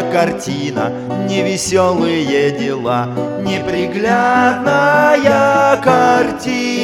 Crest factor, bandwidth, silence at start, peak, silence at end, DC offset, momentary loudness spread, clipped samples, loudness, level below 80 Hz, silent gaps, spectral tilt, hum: 14 dB; 15.5 kHz; 0 s; 0 dBFS; 0 s; under 0.1%; 9 LU; under 0.1%; -14 LUFS; -50 dBFS; none; -5 dB/octave; none